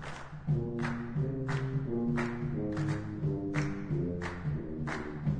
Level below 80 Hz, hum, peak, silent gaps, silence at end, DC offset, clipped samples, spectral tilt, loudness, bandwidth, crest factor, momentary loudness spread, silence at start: -50 dBFS; none; -16 dBFS; none; 0 s; under 0.1%; under 0.1%; -8 dB/octave; -35 LUFS; 9.6 kHz; 18 dB; 4 LU; 0 s